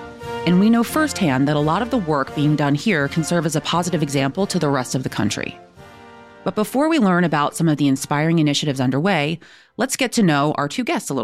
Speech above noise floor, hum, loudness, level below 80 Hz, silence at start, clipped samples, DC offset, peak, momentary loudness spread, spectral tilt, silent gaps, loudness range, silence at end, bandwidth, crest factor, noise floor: 24 dB; none; -19 LUFS; -52 dBFS; 0 s; under 0.1%; under 0.1%; -4 dBFS; 7 LU; -5.5 dB/octave; none; 3 LU; 0 s; 16 kHz; 14 dB; -42 dBFS